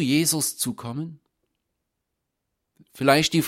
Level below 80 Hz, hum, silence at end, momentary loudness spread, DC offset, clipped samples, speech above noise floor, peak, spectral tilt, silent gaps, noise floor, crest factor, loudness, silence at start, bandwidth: -62 dBFS; none; 0 s; 15 LU; under 0.1%; under 0.1%; 58 dB; -2 dBFS; -3.5 dB/octave; none; -80 dBFS; 24 dB; -23 LUFS; 0 s; 16.5 kHz